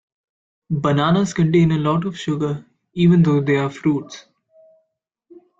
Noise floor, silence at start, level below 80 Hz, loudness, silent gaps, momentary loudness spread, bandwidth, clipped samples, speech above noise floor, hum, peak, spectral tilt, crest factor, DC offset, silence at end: -73 dBFS; 0.7 s; -52 dBFS; -18 LUFS; none; 13 LU; 7.6 kHz; under 0.1%; 56 dB; none; -6 dBFS; -7.5 dB/octave; 14 dB; under 0.1%; 1.4 s